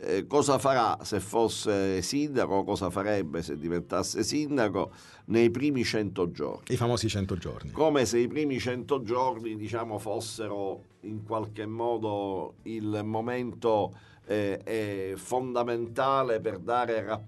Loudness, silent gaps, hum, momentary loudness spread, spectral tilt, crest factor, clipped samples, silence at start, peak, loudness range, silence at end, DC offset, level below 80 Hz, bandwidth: -29 LUFS; none; none; 10 LU; -5 dB/octave; 18 dB; under 0.1%; 0 s; -10 dBFS; 5 LU; 0 s; under 0.1%; -58 dBFS; 12 kHz